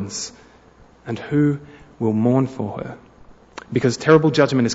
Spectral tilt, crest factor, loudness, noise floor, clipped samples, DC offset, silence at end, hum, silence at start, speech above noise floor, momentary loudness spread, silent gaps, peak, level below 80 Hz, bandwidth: -6 dB/octave; 18 dB; -19 LUFS; -49 dBFS; under 0.1%; under 0.1%; 0 s; none; 0 s; 31 dB; 19 LU; none; -2 dBFS; -54 dBFS; 8 kHz